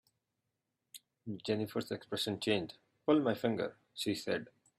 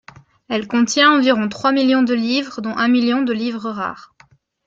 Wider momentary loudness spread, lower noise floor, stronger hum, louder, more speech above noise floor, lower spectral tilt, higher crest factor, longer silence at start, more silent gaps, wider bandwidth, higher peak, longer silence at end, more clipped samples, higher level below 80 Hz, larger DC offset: first, 17 LU vs 12 LU; first, -86 dBFS vs -53 dBFS; neither; second, -36 LUFS vs -17 LUFS; first, 51 dB vs 36 dB; first, -5 dB/octave vs -3.5 dB/octave; about the same, 20 dB vs 16 dB; first, 0.95 s vs 0.5 s; neither; first, 15.5 kHz vs 7.8 kHz; second, -18 dBFS vs -2 dBFS; second, 0.35 s vs 0.65 s; neither; second, -76 dBFS vs -62 dBFS; neither